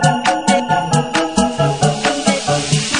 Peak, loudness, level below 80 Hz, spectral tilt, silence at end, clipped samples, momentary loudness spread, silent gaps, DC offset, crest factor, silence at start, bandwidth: 0 dBFS; -16 LUFS; -44 dBFS; -4 dB/octave; 0 s; under 0.1%; 2 LU; none; 0.5%; 16 dB; 0 s; 10.5 kHz